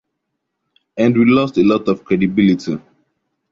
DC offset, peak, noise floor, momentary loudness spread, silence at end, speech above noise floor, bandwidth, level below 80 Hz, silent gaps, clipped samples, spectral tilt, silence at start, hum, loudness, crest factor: under 0.1%; -2 dBFS; -75 dBFS; 12 LU; 0.75 s; 61 dB; 7.4 kHz; -52 dBFS; none; under 0.1%; -7.5 dB/octave; 0.95 s; none; -15 LUFS; 14 dB